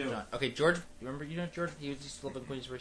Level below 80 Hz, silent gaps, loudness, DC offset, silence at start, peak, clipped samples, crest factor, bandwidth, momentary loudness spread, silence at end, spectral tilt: -58 dBFS; none; -36 LUFS; under 0.1%; 0 s; -14 dBFS; under 0.1%; 22 dB; 11 kHz; 12 LU; 0 s; -5 dB/octave